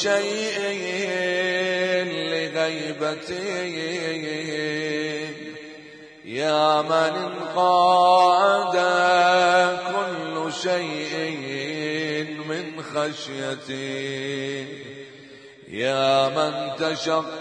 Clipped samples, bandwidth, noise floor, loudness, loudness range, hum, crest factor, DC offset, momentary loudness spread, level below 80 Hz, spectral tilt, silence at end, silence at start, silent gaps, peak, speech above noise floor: under 0.1%; 10.5 kHz; -45 dBFS; -23 LUFS; 10 LU; none; 18 dB; under 0.1%; 13 LU; -72 dBFS; -4 dB/octave; 0 s; 0 s; none; -6 dBFS; 23 dB